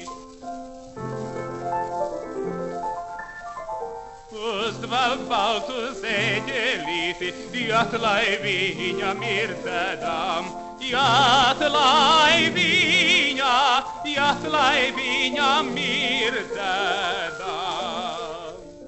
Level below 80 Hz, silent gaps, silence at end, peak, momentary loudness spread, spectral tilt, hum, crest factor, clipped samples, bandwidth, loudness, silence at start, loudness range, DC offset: -52 dBFS; none; 0 s; -6 dBFS; 17 LU; -3 dB/octave; none; 18 dB; under 0.1%; 8.4 kHz; -21 LUFS; 0 s; 13 LU; under 0.1%